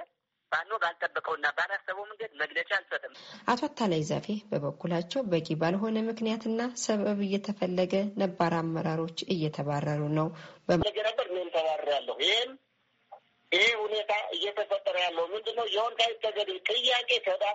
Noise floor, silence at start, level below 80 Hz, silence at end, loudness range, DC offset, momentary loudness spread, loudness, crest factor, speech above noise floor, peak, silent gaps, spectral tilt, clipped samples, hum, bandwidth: -56 dBFS; 0 s; -64 dBFS; 0 s; 3 LU; under 0.1%; 7 LU; -30 LUFS; 20 dB; 26 dB; -10 dBFS; none; -2.5 dB/octave; under 0.1%; none; 8 kHz